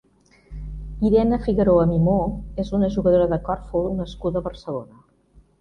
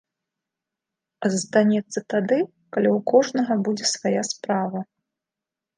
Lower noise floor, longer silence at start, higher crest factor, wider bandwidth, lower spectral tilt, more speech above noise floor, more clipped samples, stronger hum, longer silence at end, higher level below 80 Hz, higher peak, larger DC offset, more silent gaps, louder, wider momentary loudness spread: second, -55 dBFS vs -88 dBFS; second, 0.5 s vs 1.2 s; about the same, 16 dB vs 20 dB; second, 6.6 kHz vs 10 kHz; first, -9.5 dB/octave vs -4.5 dB/octave; second, 35 dB vs 66 dB; neither; neither; second, 0.75 s vs 0.95 s; first, -36 dBFS vs -74 dBFS; about the same, -6 dBFS vs -4 dBFS; neither; neither; about the same, -21 LUFS vs -22 LUFS; first, 15 LU vs 8 LU